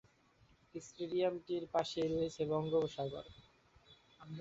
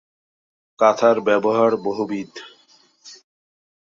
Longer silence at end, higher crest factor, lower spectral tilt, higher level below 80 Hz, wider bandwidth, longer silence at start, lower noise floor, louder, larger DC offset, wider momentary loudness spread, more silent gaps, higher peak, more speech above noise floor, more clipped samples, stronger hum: second, 0 s vs 0.75 s; about the same, 18 dB vs 20 dB; about the same, -5.5 dB/octave vs -5.5 dB/octave; about the same, -68 dBFS vs -70 dBFS; about the same, 8 kHz vs 7.6 kHz; about the same, 0.75 s vs 0.8 s; first, -69 dBFS vs -56 dBFS; second, -38 LUFS vs -19 LUFS; neither; about the same, 16 LU vs 15 LU; neither; second, -22 dBFS vs -2 dBFS; second, 32 dB vs 38 dB; neither; neither